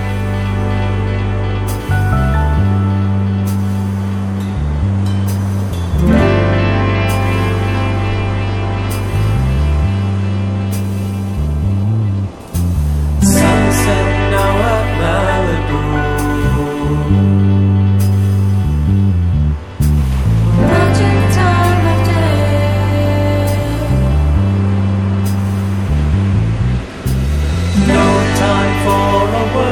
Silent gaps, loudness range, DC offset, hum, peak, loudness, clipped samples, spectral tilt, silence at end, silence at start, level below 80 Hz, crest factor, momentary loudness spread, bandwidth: none; 4 LU; under 0.1%; none; -2 dBFS; -14 LUFS; under 0.1%; -6.5 dB/octave; 0 s; 0 s; -22 dBFS; 12 dB; 6 LU; 16.5 kHz